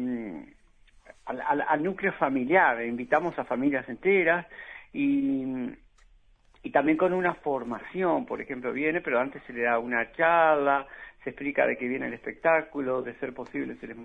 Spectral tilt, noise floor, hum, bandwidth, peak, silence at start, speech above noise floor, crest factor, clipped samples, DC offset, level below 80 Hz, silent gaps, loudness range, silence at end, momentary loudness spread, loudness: -8 dB/octave; -59 dBFS; none; 6.2 kHz; -6 dBFS; 0 s; 32 dB; 22 dB; under 0.1%; under 0.1%; -62 dBFS; none; 3 LU; 0 s; 15 LU; -27 LUFS